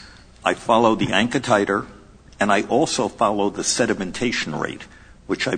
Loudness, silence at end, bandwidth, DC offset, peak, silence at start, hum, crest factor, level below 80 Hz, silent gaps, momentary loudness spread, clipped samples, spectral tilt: -21 LUFS; 0 s; 9.6 kHz; under 0.1%; -2 dBFS; 0 s; none; 20 dB; -50 dBFS; none; 9 LU; under 0.1%; -3.5 dB/octave